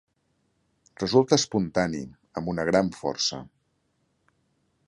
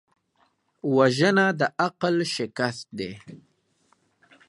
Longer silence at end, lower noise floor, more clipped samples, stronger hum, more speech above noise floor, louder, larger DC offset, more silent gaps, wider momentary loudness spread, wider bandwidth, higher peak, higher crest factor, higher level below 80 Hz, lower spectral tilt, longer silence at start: first, 1.4 s vs 1.1 s; first, -72 dBFS vs -68 dBFS; neither; neither; about the same, 47 dB vs 44 dB; about the same, -25 LUFS vs -24 LUFS; neither; neither; about the same, 14 LU vs 15 LU; about the same, 11.5 kHz vs 11.5 kHz; about the same, -4 dBFS vs -6 dBFS; about the same, 24 dB vs 20 dB; first, -56 dBFS vs -68 dBFS; about the same, -4.5 dB/octave vs -5 dB/octave; first, 1 s vs 0.85 s